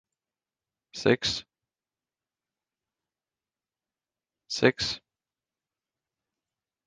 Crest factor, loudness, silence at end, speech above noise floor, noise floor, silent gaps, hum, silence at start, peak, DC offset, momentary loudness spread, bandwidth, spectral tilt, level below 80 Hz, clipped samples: 28 dB; -27 LUFS; 1.9 s; over 64 dB; under -90 dBFS; none; none; 0.95 s; -6 dBFS; under 0.1%; 13 LU; 10 kHz; -4 dB/octave; -62 dBFS; under 0.1%